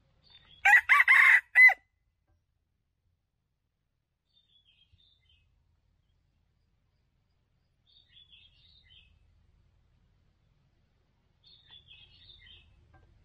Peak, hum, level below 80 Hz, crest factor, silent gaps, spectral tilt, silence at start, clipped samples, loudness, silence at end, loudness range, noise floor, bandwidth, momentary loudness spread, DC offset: -10 dBFS; none; -70 dBFS; 22 dB; none; 1 dB/octave; 0.65 s; under 0.1%; -19 LUFS; 11.5 s; 5 LU; -81 dBFS; 15 kHz; 7 LU; under 0.1%